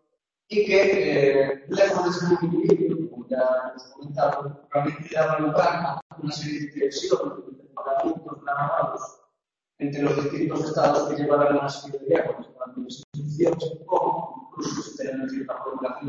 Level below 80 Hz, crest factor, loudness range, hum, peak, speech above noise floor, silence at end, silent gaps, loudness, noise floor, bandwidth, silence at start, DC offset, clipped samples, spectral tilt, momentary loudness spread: -64 dBFS; 18 dB; 6 LU; none; -6 dBFS; 58 dB; 0 s; 6.02-6.10 s, 13.04-13.12 s; -24 LUFS; -81 dBFS; 7.8 kHz; 0.5 s; under 0.1%; under 0.1%; -6 dB/octave; 14 LU